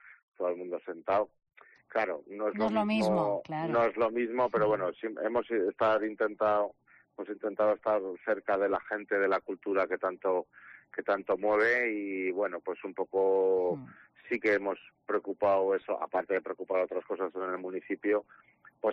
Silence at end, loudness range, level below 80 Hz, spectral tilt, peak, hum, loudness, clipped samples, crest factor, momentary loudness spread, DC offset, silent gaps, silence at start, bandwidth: 0 s; 2 LU; -70 dBFS; -4 dB/octave; -18 dBFS; none; -31 LUFS; under 0.1%; 14 dB; 9 LU; under 0.1%; 0.23-0.32 s; 0.05 s; 7.4 kHz